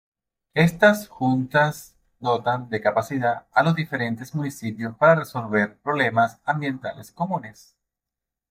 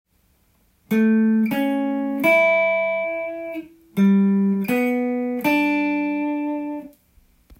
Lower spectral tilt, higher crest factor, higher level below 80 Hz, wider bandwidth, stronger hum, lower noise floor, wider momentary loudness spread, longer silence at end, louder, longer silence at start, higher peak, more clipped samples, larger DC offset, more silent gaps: about the same, -6.5 dB/octave vs -7.5 dB/octave; about the same, 20 dB vs 16 dB; about the same, -62 dBFS vs -62 dBFS; about the same, 16 kHz vs 16.5 kHz; neither; first, -87 dBFS vs -62 dBFS; about the same, 12 LU vs 13 LU; first, 1 s vs 0.7 s; second, -23 LUFS vs -20 LUFS; second, 0.55 s vs 0.9 s; first, -2 dBFS vs -6 dBFS; neither; neither; neither